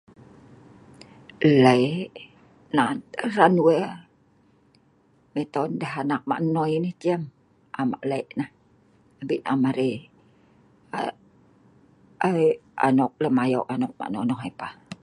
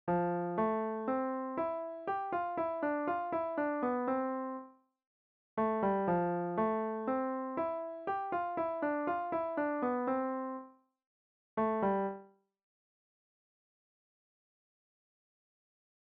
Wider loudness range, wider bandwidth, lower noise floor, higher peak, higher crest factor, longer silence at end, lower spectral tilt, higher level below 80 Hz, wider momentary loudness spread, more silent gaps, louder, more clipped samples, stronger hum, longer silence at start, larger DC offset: first, 8 LU vs 5 LU; first, 11 kHz vs 4.7 kHz; first, -61 dBFS vs -55 dBFS; first, -2 dBFS vs -22 dBFS; first, 24 dB vs 14 dB; second, 0.1 s vs 3.75 s; about the same, -7 dB/octave vs -7 dB/octave; about the same, -68 dBFS vs -72 dBFS; first, 17 LU vs 7 LU; second, none vs 5.07-5.57 s, 11.06-11.57 s; first, -24 LUFS vs -35 LUFS; neither; neither; first, 1.4 s vs 0.05 s; neither